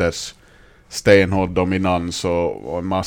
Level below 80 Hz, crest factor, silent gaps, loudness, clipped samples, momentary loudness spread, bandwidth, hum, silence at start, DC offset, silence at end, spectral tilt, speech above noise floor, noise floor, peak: -42 dBFS; 20 dB; none; -18 LUFS; under 0.1%; 15 LU; 16.5 kHz; none; 0 s; under 0.1%; 0 s; -5.5 dB/octave; 30 dB; -49 dBFS; 0 dBFS